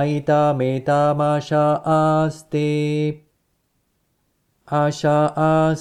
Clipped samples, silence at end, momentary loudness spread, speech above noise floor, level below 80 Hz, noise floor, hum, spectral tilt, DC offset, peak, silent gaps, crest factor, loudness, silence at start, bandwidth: under 0.1%; 0 s; 6 LU; 50 dB; -56 dBFS; -68 dBFS; none; -7.5 dB/octave; under 0.1%; -6 dBFS; none; 14 dB; -19 LUFS; 0 s; 10 kHz